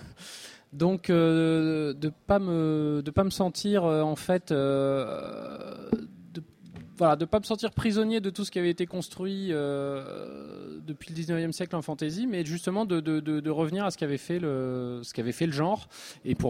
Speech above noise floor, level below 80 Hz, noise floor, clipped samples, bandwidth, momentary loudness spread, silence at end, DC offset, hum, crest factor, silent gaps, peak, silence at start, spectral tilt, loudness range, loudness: 20 dB; -56 dBFS; -47 dBFS; under 0.1%; 15.5 kHz; 17 LU; 0 s; under 0.1%; none; 18 dB; none; -10 dBFS; 0 s; -6.5 dB/octave; 6 LU; -28 LUFS